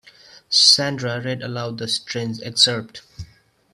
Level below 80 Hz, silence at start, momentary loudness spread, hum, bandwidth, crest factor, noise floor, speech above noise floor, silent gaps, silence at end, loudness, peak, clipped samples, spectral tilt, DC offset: -56 dBFS; 0.35 s; 16 LU; none; 14.5 kHz; 22 dB; -51 dBFS; 31 dB; none; 0.5 s; -18 LUFS; 0 dBFS; under 0.1%; -2.5 dB/octave; under 0.1%